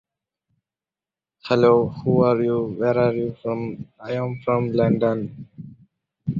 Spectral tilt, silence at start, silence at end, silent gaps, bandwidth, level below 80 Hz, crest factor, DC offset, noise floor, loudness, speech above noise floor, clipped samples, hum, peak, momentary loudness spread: -9 dB/octave; 1.45 s; 0 s; none; 7.2 kHz; -56 dBFS; 18 dB; under 0.1%; under -90 dBFS; -21 LUFS; over 69 dB; under 0.1%; none; -4 dBFS; 16 LU